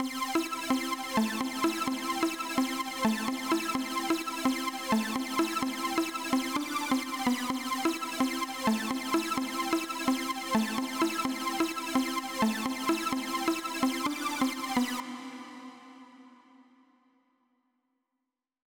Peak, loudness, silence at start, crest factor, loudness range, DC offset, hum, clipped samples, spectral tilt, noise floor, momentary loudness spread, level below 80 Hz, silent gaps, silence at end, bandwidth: -14 dBFS; -30 LUFS; 0 s; 16 dB; 4 LU; under 0.1%; none; under 0.1%; -3 dB/octave; -86 dBFS; 2 LU; -66 dBFS; none; 2.1 s; over 20 kHz